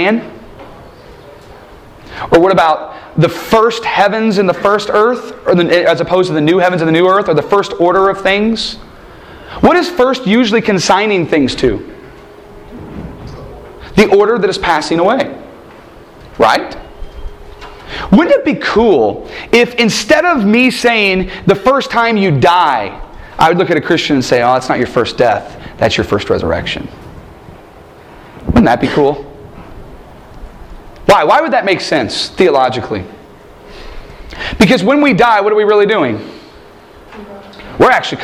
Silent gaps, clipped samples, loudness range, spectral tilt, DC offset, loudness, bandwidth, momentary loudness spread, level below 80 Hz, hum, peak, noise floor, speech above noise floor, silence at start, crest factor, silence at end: none; 0.1%; 5 LU; -5.5 dB/octave; under 0.1%; -11 LUFS; 15.5 kHz; 21 LU; -36 dBFS; none; 0 dBFS; -37 dBFS; 26 dB; 0 s; 12 dB; 0 s